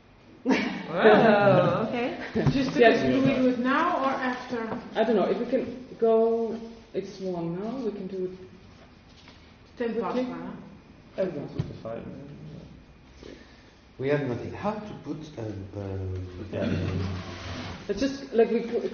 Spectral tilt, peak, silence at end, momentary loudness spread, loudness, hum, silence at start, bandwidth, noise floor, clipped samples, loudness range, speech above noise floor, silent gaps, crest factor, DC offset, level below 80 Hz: -5 dB/octave; -4 dBFS; 0 s; 17 LU; -26 LUFS; none; 0.45 s; 6.8 kHz; -53 dBFS; under 0.1%; 13 LU; 27 dB; none; 24 dB; under 0.1%; -54 dBFS